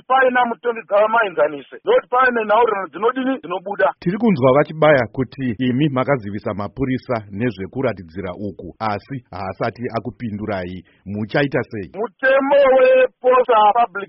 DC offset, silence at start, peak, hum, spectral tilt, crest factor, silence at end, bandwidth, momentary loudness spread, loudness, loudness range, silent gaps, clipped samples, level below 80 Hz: under 0.1%; 0.1 s; -2 dBFS; none; -4.5 dB/octave; 16 dB; 0.05 s; 5.8 kHz; 14 LU; -18 LUFS; 9 LU; none; under 0.1%; -52 dBFS